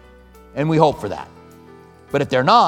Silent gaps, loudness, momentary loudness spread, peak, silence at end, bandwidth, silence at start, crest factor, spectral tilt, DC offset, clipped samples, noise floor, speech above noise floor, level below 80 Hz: none; -19 LUFS; 17 LU; 0 dBFS; 0 s; 14 kHz; 0.55 s; 18 dB; -6.5 dB/octave; under 0.1%; under 0.1%; -45 dBFS; 29 dB; -50 dBFS